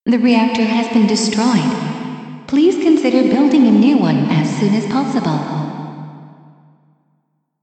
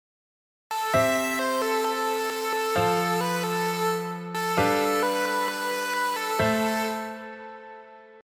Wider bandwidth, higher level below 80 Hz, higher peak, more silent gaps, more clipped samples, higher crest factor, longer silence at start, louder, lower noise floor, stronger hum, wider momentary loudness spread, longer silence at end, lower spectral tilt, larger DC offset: second, 9 kHz vs 19.5 kHz; about the same, -60 dBFS vs -60 dBFS; first, 0 dBFS vs -10 dBFS; neither; neither; about the same, 14 dB vs 18 dB; second, 0.05 s vs 0.7 s; first, -14 LUFS vs -25 LUFS; first, -65 dBFS vs -47 dBFS; neither; first, 15 LU vs 12 LU; first, 1.35 s vs 0 s; first, -6 dB/octave vs -4 dB/octave; neither